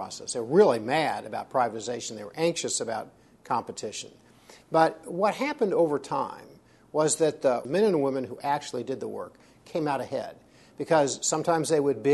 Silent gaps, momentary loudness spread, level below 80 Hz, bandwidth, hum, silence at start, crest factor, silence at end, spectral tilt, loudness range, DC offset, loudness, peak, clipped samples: none; 12 LU; -70 dBFS; 12 kHz; none; 0 s; 20 dB; 0 s; -4 dB/octave; 4 LU; under 0.1%; -27 LUFS; -6 dBFS; under 0.1%